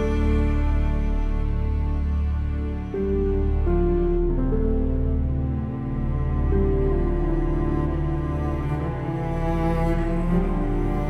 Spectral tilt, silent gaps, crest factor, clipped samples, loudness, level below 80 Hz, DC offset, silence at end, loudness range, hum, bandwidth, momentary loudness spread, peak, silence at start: -9.5 dB/octave; none; 12 dB; under 0.1%; -25 LUFS; -24 dBFS; under 0.1%; 0 s; 1 LU; none; 4.6 kHz; 5 LU; -10 dBFS; 0 s